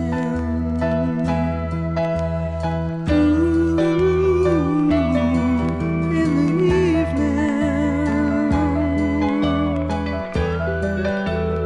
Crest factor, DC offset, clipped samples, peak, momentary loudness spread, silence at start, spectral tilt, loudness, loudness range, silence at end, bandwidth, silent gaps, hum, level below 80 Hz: 14 dB; under 0.1%; under 0.1%; -6 dBFS; 6 LU; 0 s; -8 dB/octave; -20 LUFS; 3 LU; 0 s; 10.5 kHz; none; none; -36 dBFS